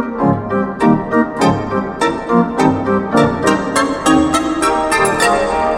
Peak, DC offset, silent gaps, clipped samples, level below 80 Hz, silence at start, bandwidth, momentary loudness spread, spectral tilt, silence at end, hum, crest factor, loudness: 0 dBFS; under 0.1%; none; under 0.1%; -38 dBFS; 0 s; 16.5 kHz; 4 LU; -5 dB/octave; 0 s; none; 14 dB; -14 LUFS